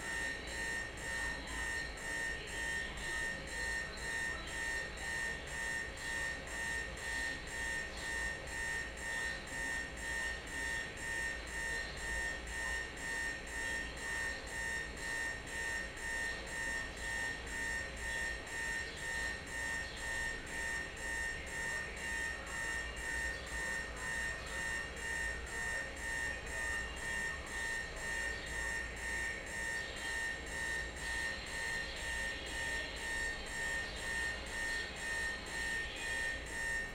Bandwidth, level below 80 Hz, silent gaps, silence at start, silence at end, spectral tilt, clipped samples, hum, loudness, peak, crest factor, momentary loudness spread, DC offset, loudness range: 17.5 kHz; -50 dBFS; none; 0 s; 0 s; -2 dB/octave; under 0.1%; none; -39 LUFS; -28 dBFS; 14 dB; 2 LU; under 0.1%; 1 LU